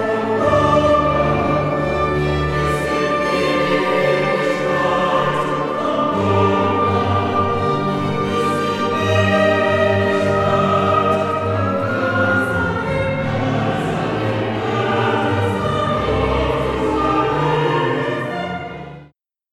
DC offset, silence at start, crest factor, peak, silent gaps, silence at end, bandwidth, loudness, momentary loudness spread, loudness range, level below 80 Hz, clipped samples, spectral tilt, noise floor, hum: under 0.1%; 0 s; 14 dB; -4 dBFS; none; 0.5 s; 14 kHz; -18 LUFS; 5 LU; 3 LU; -38 dBFS; under 0.1%; -6.5 dB/octave; -50 dBFS; none